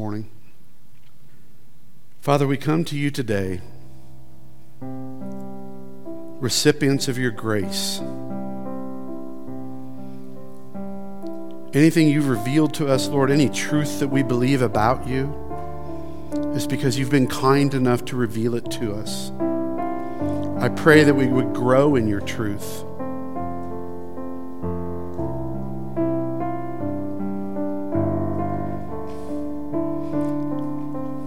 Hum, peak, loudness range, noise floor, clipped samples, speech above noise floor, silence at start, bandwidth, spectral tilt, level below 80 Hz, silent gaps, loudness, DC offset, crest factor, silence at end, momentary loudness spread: none; 0 dBFS; 11 LU; -55 dBFS; under 0.1%; 35 dB; 0 s; 16.5 kHz; -6 dB/octave; -48 dBFS; none; -23 LUFS; 3%; 22 dB; 0 s; 17 LU